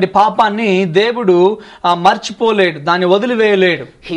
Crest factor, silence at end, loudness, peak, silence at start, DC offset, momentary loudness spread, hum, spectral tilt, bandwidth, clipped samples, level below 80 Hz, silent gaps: 12 dB; 0 s; -13 LUFS; 0 dBFS; 0 s; under 0.1%; 4 LU; none; -5.5 dB/octave; 9.6 kHz; under 0.1%; -54 dBFS; none